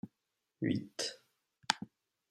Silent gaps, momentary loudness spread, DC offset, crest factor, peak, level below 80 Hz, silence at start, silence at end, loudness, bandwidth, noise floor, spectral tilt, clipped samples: none; 18 LU; under 0.1%; 34 dB; -8 dBFS; -80 dBFS; 0.05 s; 0.45 s; -38 LUFS; 15 kHz; -86 dBFS; -3.5 dB/octave; under 0.1%